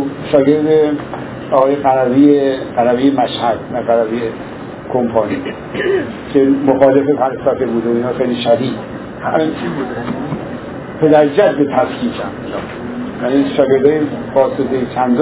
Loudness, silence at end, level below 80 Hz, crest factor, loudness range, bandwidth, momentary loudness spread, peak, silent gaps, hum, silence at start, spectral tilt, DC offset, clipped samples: -14 LUFS; 0 s; -46 dBFS; 14 dB; 4 LU; 4 kHz; 13 LU; 0 dBFS; none; none; 0 s; -11 dB/octave; under 0.1%; under 0.1%